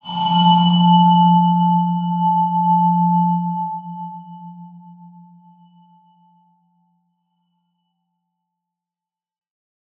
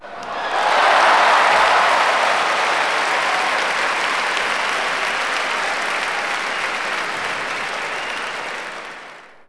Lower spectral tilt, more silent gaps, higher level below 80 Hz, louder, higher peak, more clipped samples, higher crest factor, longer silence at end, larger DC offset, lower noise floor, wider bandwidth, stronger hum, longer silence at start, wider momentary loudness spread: first, -10.5 dB/octave vs -0.5 dB/octave; neither; second, -74 dBFS vs -58 dBFS; first, -15 LUFS vs -18 LUFS; about the same, -2 dBFS vs -4 dBFS; neither; about the same, 16 dB vs 16 dB; first, 5.2 s vs 0.05 s; neither; first, -90 dBFS vs -40 dBFS; second, 3.5 kHz vs 11 kHz; neither; about the same, 0.05 s vs 0 s; first, 20 LU vs 12 LU